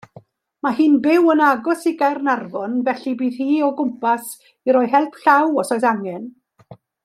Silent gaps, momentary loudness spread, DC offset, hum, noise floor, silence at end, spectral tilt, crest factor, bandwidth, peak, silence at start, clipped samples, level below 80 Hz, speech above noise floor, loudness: none; 11 LU; under 0.1%; none; -47 dBFS; 0.3 s; -5 dB/octave; 16 dB; 14.5 kHz; -2 dBFS; 0.65 s; under 0.1%; -72 dBFS; 29 dB; -18 LUFS